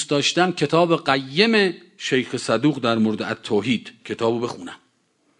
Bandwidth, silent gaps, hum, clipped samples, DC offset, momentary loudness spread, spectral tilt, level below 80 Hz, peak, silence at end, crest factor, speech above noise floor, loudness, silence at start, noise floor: 10.5 kHz; none; none; under 0.1%; under 0.1%; 10 LU; -4.5 dB/octave; -64 dBFS; -2 dBFS; 0.65 s; 20 dB; 44 dB; -21 LUFS; 0 s; -65 dBFS